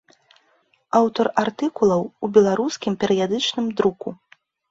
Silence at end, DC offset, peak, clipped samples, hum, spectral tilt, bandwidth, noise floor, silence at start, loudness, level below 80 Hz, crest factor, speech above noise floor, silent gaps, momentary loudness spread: 0.55 s; under 0.1%; -2 dBFS; under 0.1%; none; -5 dB/octave; 7.8 kHz; -63 dBFS; 0.95 s; -20 LUFS; -62 dBFS; 18 dB; 43 dB; none; 7 LU